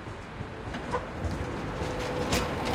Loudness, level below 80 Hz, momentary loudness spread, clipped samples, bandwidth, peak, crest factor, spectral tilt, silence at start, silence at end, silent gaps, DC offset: -33 LUFS; -42 dBFS; 11 LU; under 0.1%; 16.5 kHz; -12 dBFS; 20 dB; -5 dB/octave; 0 s; 0 s; none; under 0.1%